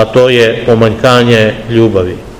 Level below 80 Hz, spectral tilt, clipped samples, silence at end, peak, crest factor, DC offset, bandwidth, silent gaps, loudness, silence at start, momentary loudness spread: -34 dBFS; -6 dB/octave; 4%; 0 s; 0 dBFS; 8 dB; 1%; 15.5 kHz; none; -8 LUFS; 0 s; 4 LU